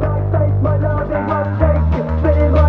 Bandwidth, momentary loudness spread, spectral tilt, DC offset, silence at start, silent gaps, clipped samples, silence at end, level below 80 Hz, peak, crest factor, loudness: 4.4 kHz; 4 LU; -11 dB/octave; under 0.1%; 0 s; none; under 0.1%; 0 s; -20 dBFS; 0 dBFS; 14 dB; -16 LUFS